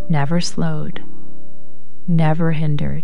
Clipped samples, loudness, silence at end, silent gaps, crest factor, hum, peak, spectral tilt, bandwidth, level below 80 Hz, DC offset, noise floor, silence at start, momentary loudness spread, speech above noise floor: under 0.1%; -20 LUFS; 0 s; none; 16 dB; none; -6 dBFS; -6.5 dB/octave; 11 kHz; -46 dBFS; 20%; -49 dBFS; 0 s; 14 LU; 30 dB